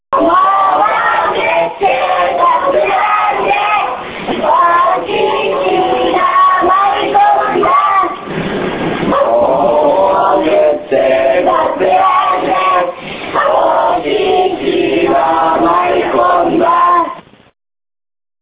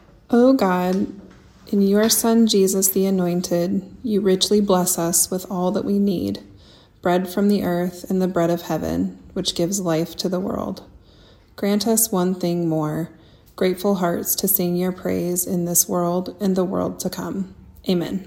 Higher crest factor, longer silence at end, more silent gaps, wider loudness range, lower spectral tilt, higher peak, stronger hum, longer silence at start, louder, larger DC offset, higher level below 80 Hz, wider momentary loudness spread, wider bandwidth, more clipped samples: second, 12 dB vs 18 dB; first, 1.2 s vs 0 s; neither; second, 1 LU vs 5 LU; first, -8.5 dB/octave vs -4.5 dB/octave; about the same, 0 dBFS vs -2 dBFS; neither; second, 0.1 s vs 0.3 s; first, -11 LUFS vs -20 LUFS; neither; first, -44 dBFS vs -52 dBFS; second, 5 LU vs 10 LU; second, 4 kHz vs 17.5 kHz; neither